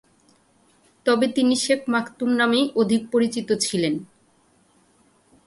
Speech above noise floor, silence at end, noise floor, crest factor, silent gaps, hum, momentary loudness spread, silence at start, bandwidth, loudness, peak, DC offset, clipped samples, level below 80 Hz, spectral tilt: 39 dB; 1.4 s; -60 dBFS; 18 dB; none; none; 5 LU; 1.05 s; 11.5 kHz; -22 LUFS; -6 dBFS; under 0.1%; under 0.1%; -66 dBFS; -4 dB/octave